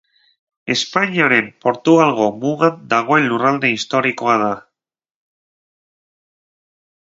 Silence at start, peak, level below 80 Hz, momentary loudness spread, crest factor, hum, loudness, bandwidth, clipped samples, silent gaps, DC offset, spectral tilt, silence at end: 0.65 s; 0 dBFS; -64 dBFS; 8 LU; 18 dB; none; -16 LUFS; 7.8 kHz; under 0.1%; none; under 0.1%; -5 dB/octave; 2.4 s